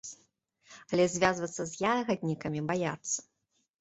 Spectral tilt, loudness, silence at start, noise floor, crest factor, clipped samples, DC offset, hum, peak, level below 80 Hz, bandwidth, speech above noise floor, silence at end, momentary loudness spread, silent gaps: -4.5 dB/octave; -31 LUFS; 0.05 s; -70 dBFS; 24 dB; under 0.1%; under 0.1%; none; -10 dBFS; -64 dBFS; 8.2 kHz; 40 dB; 0.6 s; 8 LU; none